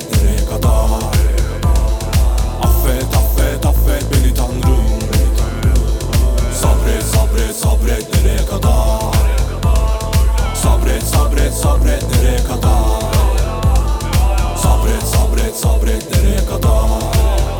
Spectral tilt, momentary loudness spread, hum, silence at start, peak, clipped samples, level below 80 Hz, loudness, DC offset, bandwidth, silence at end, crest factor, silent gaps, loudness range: -5.5 dB/octave; 2 LU; none; 0 s; 0 dBFS; under 0.1%; -14 dBFS; -15 LUFS; under 0.1%; 19 kHz; 0 s; 12 dB; none; 1 LU